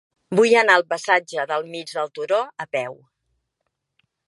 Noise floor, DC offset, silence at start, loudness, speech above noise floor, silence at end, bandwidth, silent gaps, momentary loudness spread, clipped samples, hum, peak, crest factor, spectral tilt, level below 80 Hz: -77 dBFS; under 0.1%; 0.3 s; -20 LUFS; 57 dB; 1.35 s; 11.5 kHz; none; 13 LU; under 0.1%; none; -2 dBFS; 22 dB; -3.5 dB/octave; -78 dBFS